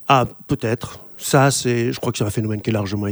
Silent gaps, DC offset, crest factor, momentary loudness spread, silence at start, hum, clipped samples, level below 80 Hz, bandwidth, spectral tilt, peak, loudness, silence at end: none; under 0.1%; 20 dB; 9 LU; 0 s; none; under 0.1%; -50 dBFS; over 20 kHz; -5 dB/octave; 0 dBFS; -20 LUFS; 0 s